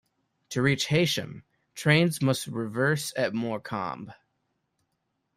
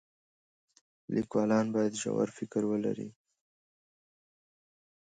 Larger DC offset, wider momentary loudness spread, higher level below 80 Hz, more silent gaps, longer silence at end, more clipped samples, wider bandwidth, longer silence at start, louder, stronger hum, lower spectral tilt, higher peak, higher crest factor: neither; first, 15 LU vs 8 LU; first, -62 dBFS vs -74 dBFS; neither; second, 1.25 s vs 1.95 s; neither; first, 15.5 kHz vs 9.4 kHz; second, 0.5 s vs 1.1 s; first, -27 LUFS vs -32 LUFS; neither; about the same, -5 dB/octave vs -6 dB/octave; first, -8 dBFS vs -16 dBFS; about the same, 20 dB vs 18 dB